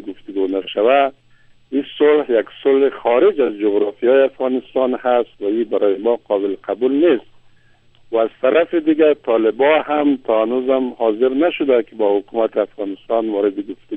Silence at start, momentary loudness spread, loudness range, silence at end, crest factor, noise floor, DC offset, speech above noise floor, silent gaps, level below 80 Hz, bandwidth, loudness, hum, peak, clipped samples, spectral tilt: 0 s; 7 LU; 2 LU; 0 s; 16 dB; -51 dBFS; under 0.1%; 35 dB; none; -60 dBFS; 3.9 kHz; -17 LUFS; none; 0 dBFS; under 0.1%; -8 dB/octave